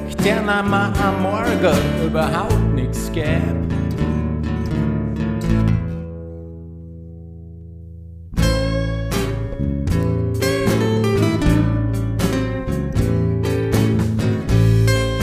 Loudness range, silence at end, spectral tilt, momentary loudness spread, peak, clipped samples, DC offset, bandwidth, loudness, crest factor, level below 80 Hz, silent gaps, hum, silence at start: 6 LU; 0 s; -6.5 dB/octave; 19 LU; -2 dBFS; under 0.1%; under 0.1%; 15.5 kHz; -19 LUFS; 16 dB; -28 dBFS; none; none; 0 s